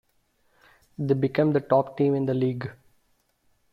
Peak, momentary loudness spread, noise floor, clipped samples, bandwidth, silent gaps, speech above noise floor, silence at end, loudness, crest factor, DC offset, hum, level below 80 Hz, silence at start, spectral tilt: -6 dBFS; 13 LU; -68 dBFS; under 0.1%; 5.8 kHz; none; 45 dB; 1 s; -25 LUFS; 20 dB; under 0.1%; none; -64 dBFS; 1 s; -10 dB/octave